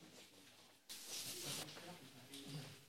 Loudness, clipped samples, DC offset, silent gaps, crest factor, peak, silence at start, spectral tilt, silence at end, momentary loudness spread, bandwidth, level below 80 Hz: -50 LUFS; under 0.1%; under 0.1%; none; 20 dB; -34 dBFS; 0 s; -2 dB/octave; 0 s; 16 LU; 16.5 kHz; under -90 dBFS